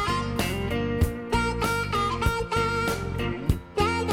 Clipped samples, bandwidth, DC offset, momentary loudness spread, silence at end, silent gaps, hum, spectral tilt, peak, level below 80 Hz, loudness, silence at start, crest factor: under 0.1%; 17 kHz; under 0.1%; 3 LU; 0 s; none; none; -5.5 dB/octave; -8 dBFS; -34 dBFS; -26 LUFS; 0 s; 18 dB